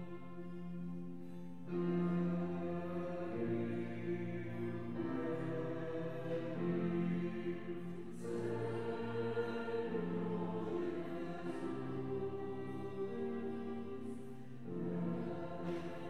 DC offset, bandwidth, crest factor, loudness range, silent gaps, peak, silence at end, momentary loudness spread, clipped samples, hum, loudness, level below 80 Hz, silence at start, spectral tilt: 0.4%; 10 kHz; 14 dB; 3 LU; none; -26 dBFS; 0 s; 9 LU; under 0.1%; none; -42 LUFS; -76 dBFS; 0 s; -8.5 dB/octave